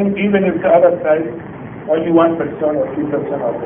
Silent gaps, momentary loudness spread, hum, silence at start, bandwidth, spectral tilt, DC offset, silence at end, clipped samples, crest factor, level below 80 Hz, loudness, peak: none; 13 LU; none; 0 s; 3.6 kHz; -12 dB/octave; under 0.1%; 0 s; under 0.1%; 14 dB; -50 dBFS; -15 LUFS; 0 dBFS